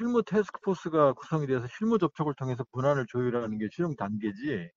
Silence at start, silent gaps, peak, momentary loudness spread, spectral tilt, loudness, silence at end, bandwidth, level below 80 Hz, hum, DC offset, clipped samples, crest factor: 0 s; none; -10 dBFS; 7 LU; -7 dB/octave; -29 LUFS; 0.1 s; 7.4 kHz; -66 dBFS; none; under 0.1%; under 0.1%; 18 dB